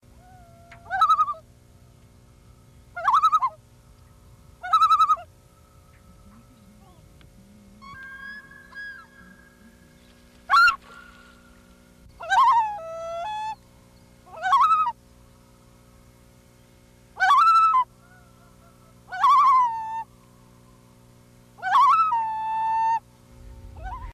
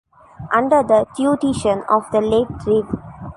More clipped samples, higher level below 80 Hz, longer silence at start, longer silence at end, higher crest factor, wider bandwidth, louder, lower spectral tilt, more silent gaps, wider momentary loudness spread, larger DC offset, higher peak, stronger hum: neither; second, -54 dBFS vs -44 dBFS; first, 0.85 s vs 0.4 s; about the same, 0 s vs 0.05 s; about the same, 14 dB vs 16 dB; first, 15.5 kHz vs 11.5 kHz; second, -21 LUFS vs -17 LUFS; second, -2 dB/octave vs -6 dB/octave; neither; first, 22 LU vs 7 LU; neither; second, -12 dBFS vs -2 dBFS; neither